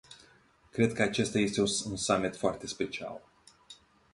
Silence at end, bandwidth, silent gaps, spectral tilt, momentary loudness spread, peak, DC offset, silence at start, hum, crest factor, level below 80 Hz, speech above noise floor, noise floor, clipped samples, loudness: 0.4 s; 11.5 kHz; none; -4 dB/octave; 12 LU; -12 dBFS; under 0.1%; 0.1 s; none; 22 dB; -60 dBFS; 32 dB; -62 dBFS; under 0.1%; -31 LUFS